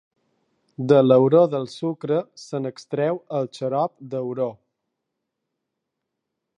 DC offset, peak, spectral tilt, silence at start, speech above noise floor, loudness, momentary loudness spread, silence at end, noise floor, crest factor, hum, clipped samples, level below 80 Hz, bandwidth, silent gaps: under 0.1%; -2 dBFS; -8 dB/octave; 0.8 s; 60 dB; -22 LUFS; 14 LU; 2.05 s; -81 dBFS; 20 dB; none; under 0.1%; -74 dBFS; 10 kHz; none